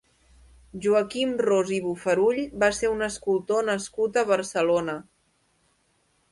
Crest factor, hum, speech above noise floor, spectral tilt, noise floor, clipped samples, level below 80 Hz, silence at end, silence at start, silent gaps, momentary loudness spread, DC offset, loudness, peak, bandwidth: 18 dB; none; 44 dB; -4 dB/octave; -68 dBFS; under 0.1%; -58 dBFS; 1.3 s; 0.75 s; none; 5 LU; under 0.1%; -25 LUFS; -8 dBFS; 11.5 kHz